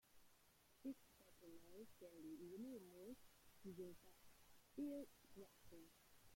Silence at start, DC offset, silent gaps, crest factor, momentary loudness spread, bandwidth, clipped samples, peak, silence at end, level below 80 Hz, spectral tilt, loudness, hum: 0.05 s; under 0.1%; none; 18 dB; 14 LU; 16.5 kHz; under 0.1%; -42 dBFS; 0 s; -82 dBFS; -5.5 dB/octave; -59 LUFS; none